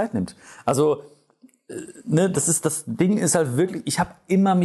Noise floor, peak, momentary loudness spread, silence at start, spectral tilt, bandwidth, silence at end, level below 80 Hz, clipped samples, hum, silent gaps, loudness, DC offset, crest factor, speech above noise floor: -56 dBFS; -8 dBFS; 14 LU; 0 s; -5 dB/octave; 12.5 kHz; 0 s; -56 dBFS; under 0.1%; none; none; -22 LUFS; under 0.1%; 16 dB; 34 dB